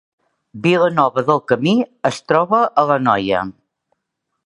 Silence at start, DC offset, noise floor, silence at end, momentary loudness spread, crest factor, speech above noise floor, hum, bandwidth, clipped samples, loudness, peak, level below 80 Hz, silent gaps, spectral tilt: 0.55 s; under 0.1%; -76 dBFS; 0.95 s; 7 LU; 18 dB; 60 dB; none; 11 kHz; under 0.1%; -16 LUFS; 0 dBFS; -56 dBFS; none; -6 dB/octave